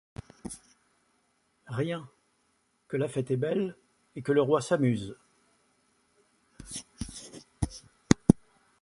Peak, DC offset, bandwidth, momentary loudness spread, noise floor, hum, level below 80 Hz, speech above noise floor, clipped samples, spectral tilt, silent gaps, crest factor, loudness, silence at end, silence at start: -2 dBFS; under 0.1%; 11.5 kHz; 20 LU; -72 dBFS; none; -52 dBFS; 43 dB; under 0.1%; -6 dB/octave; none; 30 dB; -30 LUFS; 0.45 s; 0.45 s